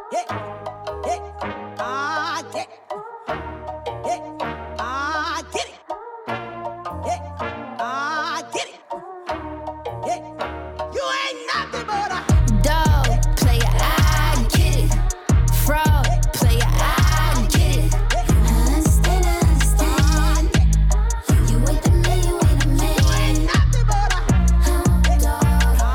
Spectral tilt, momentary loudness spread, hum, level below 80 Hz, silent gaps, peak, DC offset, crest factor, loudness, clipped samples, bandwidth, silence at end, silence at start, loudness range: -5 dB/octave; 13 LU; none; -20 dBFS; none; -6 dBFS; under 0.1%; 12 dB; -20 LUFS; under 0.1%; 18 kHz; 0 s; 0 s; 9 LU